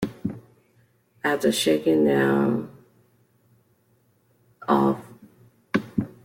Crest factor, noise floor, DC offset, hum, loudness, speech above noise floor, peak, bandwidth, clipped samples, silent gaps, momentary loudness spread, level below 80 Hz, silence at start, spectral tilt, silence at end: 20 dB; -64 dBFS; under 0.1%; none; -23 LUFS; 43 dB; -6 dBFS; 16.5 kHz; under 0.1%; none; 14 LU; -60 dBFS; 0 s; -5.5 dB/octave; 0.2 s